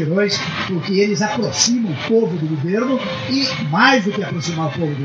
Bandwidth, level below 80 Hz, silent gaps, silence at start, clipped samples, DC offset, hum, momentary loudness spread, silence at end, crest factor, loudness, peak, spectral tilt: 11 kHz; -58 dBFS; none; 0 s; under 0.1%; under 0.1%; none; 8 LU; 0 s; 18 dB; -18 LUFS; 0 dBFS; -4 dB/octave